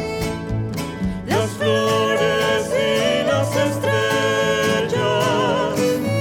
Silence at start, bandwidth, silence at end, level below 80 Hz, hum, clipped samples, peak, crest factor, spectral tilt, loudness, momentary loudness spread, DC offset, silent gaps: 0 s; 18.5 kHz; 0 s; -42 dBFS; none; under 0.1%; -6 dBFS; 14 dB; -4.5 dB/octave; -19 LUFS; 7 LU; under 0.1%; none